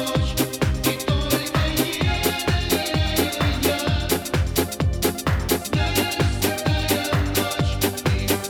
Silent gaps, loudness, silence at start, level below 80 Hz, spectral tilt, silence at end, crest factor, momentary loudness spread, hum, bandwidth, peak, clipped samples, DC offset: none; -22 LUFS; 0 s; -30 dBFS; -4.5 dB/octave; 0 s; 12 dB; 2 LU; none; over 20 kHz; -10 dBFS; under 0.1%; under 0.1%